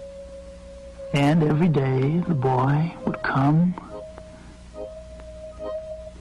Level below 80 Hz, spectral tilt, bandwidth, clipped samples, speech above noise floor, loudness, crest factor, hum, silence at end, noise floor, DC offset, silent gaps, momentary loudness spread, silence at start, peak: -46 dBFS; -8 dB/octave; 11 kHz; under 0.1%; 22 dB; -22 LUFS; 12 dB; none; 0 s; -43 dBFS; under 0.1%; none; 22 LU; 0 s; -12 dBFS